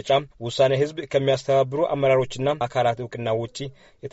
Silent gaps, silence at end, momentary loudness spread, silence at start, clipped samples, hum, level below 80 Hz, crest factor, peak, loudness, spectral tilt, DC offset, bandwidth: none; 0.05 s; 11 LU; 0.05 s; under 0.1%; none; -56 dBFS; 16 dB; -6 dBFS; -23 LUFS; -4.5 dB/octave; under 0.1%; 8 kHz